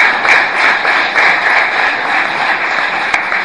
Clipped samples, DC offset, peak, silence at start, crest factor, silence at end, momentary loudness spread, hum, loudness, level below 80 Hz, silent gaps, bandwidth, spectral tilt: under 0.1%; 0.4%; 0 dBFS; 0 s; 12 dB; 0 s; 4 LU; none; -10 LUFS; -54 dBFS; none; 11 kHz; -1.5 dB/octave